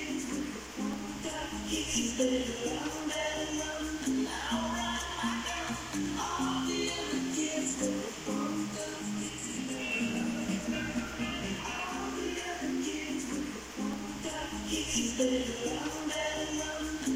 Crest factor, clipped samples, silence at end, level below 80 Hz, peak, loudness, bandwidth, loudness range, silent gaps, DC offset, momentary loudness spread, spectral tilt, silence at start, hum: 18 dB; under 0.1%; 0 s; -52 dBFS; -16 dBFS; -34 LUFS; 16 kHz; 2 LU; none; under 0.1%; 6 LU; -3 dB/octave; 0 s; none